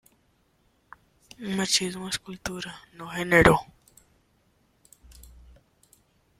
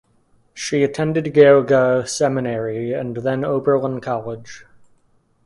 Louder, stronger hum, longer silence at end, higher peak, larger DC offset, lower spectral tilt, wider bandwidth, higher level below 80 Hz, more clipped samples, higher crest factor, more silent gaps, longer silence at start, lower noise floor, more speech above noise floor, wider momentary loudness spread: second, -24 LUFS vs -18 LUFS; neither; first, 1.2 s vs 0.85 s; about the same, -2 dBFS vs 0 dBFS; neither; second, -3.5 dB/octave vs -5.5 dB/octave; first, 16 kHz vs 11.5 kHz; first, -48 dBFS vs -58 dBFS; neither; first, 28 dB vs 18 dB; neither; first, 1.4 s vs 0.55 s; first, -67 dBFS vs -59 dBFS; about the same, 42 dB vs 42 dB; first, 20 LU vs 13 LU